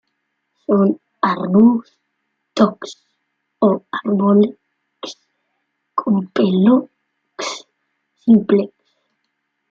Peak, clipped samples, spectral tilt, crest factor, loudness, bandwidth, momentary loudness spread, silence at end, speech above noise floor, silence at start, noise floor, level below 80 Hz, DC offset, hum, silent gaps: -2 dBFS; under 0.1%; -7 dB/octave; 16 dB; -17 LUFS; 7.6 kHz; 20 LU; 1.05 s; 58 dB; 0.7 s; -72 dBFS; -64 dBFS; under 0.1%; none; none